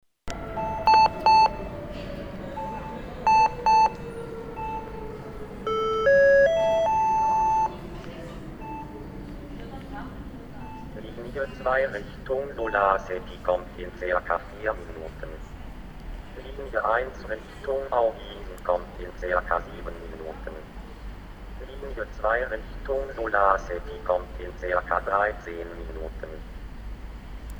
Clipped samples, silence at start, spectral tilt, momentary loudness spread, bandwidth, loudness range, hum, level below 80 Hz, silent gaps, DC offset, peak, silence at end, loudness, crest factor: under 0.1%; 0.25 s; -5 dB/octave; 21 LU; 20 kHz; 10 LU; none; -42 dBFS; none; under 0.1%; -6 dBFS; 0 s; -25 LUFS; 22 dB